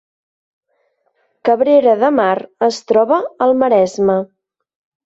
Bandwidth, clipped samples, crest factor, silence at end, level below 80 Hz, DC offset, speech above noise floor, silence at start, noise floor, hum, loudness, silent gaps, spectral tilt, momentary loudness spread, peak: 8 kHz; under 0.1%; 14 dB; 0.85 s; -60 dBFS; under 0.1%; 51 dB; 1.45 s; -64 dBFS; none; -14 LUFS; none; -5.5 dB/octave; 7 LU; -2 dBFS